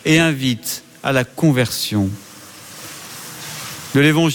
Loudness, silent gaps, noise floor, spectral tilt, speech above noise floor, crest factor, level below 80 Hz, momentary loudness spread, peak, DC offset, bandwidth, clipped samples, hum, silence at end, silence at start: -18 LUFS; none; -38 dBFS; -5 dB/octave; 22 dB; 16 dB; -50 dBFS; 19 LU; -2 dBFS; under 0.1%; 17.5 kHz; under 0.1%; none; 0 s; 0.05 s